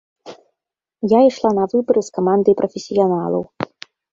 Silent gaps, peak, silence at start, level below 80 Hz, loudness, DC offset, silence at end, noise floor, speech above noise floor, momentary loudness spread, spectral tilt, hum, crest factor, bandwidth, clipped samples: none; -2 dBFS; 0.25 s; -60 dBFS; -17 LUFS; under 0.1%; 0.5 s; -83 dBFS; 67 dB; 13 LU; -7 dB/octave; none; 16 dB; 7.6 kHz; under 0.1%